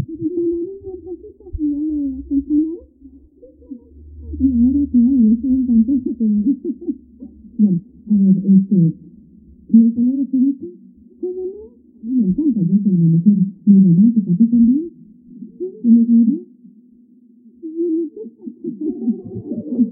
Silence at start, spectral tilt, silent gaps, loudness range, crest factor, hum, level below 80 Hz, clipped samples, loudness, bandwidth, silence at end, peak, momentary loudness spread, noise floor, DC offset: 0 s; -19 dB/octave; none; 9 LU; 16 dB; none; -42 dBFS; under 0.1%; -16 LUFS; 0.8 kHz; 0 s; 0 dBFS; 20 LU; -49 dBFS; under 0.1%